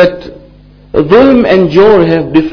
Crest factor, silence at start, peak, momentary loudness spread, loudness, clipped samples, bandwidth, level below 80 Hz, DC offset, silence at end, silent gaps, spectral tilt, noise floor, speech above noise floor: 8 dB; 0 s; 0 dBFS; 9 LU; -7 LUFS; 8%; 5.4 kHz; -34 dBFS; under 0.1%; 0 s; none; -8 dB/octave; -37 dBFS; 30 dB